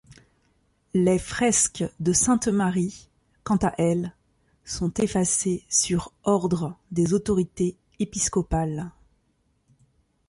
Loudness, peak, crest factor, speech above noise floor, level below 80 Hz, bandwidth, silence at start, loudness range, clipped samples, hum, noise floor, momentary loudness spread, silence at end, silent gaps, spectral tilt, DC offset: -24 LUFS; -8 dBFS; 18 dB; 45 dB; -46 dBFS; 11.5 kHz; 0.1 s; 3 LU; under 0.1%; none; -69 dBFS; 9 LU; 1.4 s; none; -4.5 dB/octave; under 0.1%